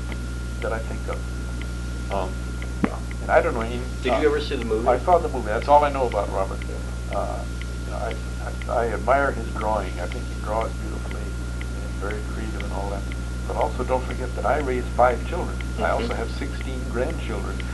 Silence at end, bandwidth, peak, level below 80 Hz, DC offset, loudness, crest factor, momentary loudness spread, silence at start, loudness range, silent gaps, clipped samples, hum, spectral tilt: 0 s; 12 kHz; -4 dBFS; -30 dBFS; under 0.1%; -25 LUFS; 20 dB; 10 LU; 0 s; 7 LU; none; under 0.1%; 60 Hz at -30 dBFS; -6 dB/octave